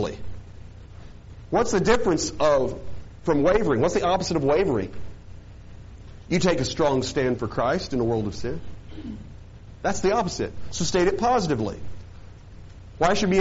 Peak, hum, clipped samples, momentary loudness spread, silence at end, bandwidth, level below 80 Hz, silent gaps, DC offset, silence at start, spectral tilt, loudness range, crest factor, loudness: -2 dBFS; none; under 0.1%; 24 LU; 0 s; 8 kHz; -42 dBFS; none; under 0.1%; 0 s; -5 dB/octave; 5 LU; 22 dB; -24 LUFS